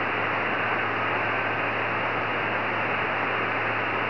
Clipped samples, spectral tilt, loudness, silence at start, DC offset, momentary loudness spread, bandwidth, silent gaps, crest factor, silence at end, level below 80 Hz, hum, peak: under 0.1%; -6.5 dB/octave; -25 LUFS; 0 s; 0.5%; 1 LU; 5.4 kHz; none; 12 dB; 0 s; -60 dBFS; none; -14 dBFS